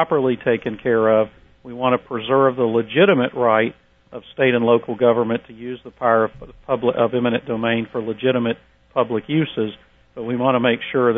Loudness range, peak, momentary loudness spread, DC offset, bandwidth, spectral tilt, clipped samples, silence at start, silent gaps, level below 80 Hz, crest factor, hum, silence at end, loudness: 4 LU; -2 dBFS; 11 LU; under 0.1%; 3.8 kHz; -9.5 dB/octave; under 0.1%; 0 s; none; -56 dBFS; 18 dB; none; 0 s; -19 LUFS